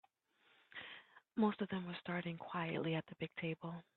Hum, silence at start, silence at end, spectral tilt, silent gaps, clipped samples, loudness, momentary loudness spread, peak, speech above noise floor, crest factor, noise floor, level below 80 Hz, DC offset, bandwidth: none; 0.75 s; 0.15 s; -5 dB/octave; none; under 0.1%; -42 LUFS; 15 LU; -22 dBFS; 34 dB; 22 dB; -75 dBFS; -80 dBFS; under 0.1%; 4.3 kHz